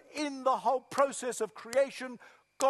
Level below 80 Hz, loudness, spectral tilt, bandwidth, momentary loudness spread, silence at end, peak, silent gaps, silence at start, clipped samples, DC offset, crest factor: -84 dBFS; -32 LUFS; -2.5 dB/octave; 12.5 kHz; 12 LU; 0 s; -12 dBFS; none; 0.1 s; under 0.1%; under 0.1%; 20 dB